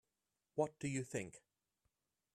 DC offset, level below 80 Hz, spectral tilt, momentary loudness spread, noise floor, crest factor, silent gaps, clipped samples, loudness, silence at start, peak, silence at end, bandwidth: under 0.1%; -78 dBFS; -5.5 dB/octave; 7 LU; -90 dBFS; 22 dB; none; under 0.1%; -43 LUFS; 0.55 s; -24 dBFS; 0.95 s; 13.5 kHz